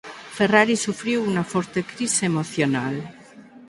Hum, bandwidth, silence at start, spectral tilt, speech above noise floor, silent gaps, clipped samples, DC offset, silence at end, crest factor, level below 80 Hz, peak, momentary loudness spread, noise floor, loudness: none; 11.5 kHz; 0.05 s; -4 dB/octave; 24 dB; none; under 0.1%; under 0.1%; 0 s; 22 dB; -62 dBFS; -2 dBFS; 12 LU; -46 dBFS; -22 LUFS